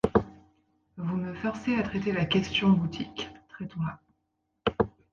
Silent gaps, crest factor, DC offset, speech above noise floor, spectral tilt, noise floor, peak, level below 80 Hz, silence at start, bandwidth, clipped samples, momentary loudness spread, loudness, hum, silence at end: none; 22 dB; under 0.1%; 51 dB; -6.5 dB/octave; -78 dBFS; -8 dBFS; -52 dBFS; 0.05 s; 7.2 kHz; under 0.1%; 15 LU; -29 LUFS; none; 0.25 s